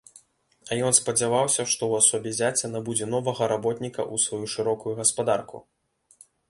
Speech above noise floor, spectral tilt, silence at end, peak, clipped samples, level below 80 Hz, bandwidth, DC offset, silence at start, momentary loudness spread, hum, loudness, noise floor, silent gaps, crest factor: 34 dB; -3 dB/octave; 0.9 s; -4 dBFS; under 0.1%; -64 dBFS; 12 kHz; under 0.1%; 0.65 s; 9 LU; none; -24 LUFS; -59 dBFS; none; 22 dB